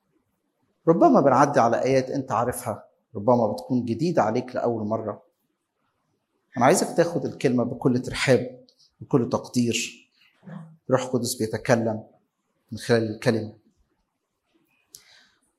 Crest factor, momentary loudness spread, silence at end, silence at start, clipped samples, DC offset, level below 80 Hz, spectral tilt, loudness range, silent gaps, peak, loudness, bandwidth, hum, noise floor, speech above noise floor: 22 dB; 17 LU; 2.1 s; 0.85 s; under 0.1%; under 0.1%; -60 dBFS; -5.5 dB/octave; 6 LU; none; -4 dBFS; -23 LUFS; 14 kHz; none; -76 dBFS; 54 dB